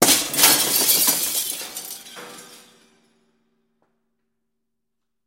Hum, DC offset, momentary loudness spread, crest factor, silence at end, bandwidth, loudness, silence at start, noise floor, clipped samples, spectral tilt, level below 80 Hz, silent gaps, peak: none; under 0.1%; 23 LU; 24 dB; 2.7 s; 16.5 kHz; -16 LUFS; 0 s; -82 dBFS; under 0.1%; 0 dB/octave; -62 dBFS; none; 0 dBFS